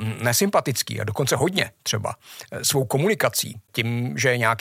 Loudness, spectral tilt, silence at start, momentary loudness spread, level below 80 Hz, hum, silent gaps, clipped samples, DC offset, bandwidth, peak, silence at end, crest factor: -22 LUFS; -3.5 dB/octave; 0 s; 7 LU; -64 dBFS; none; none; under 0.1%; under 0.1%; 16.5 kHz; -4 dBFS; 0 s; 20 dB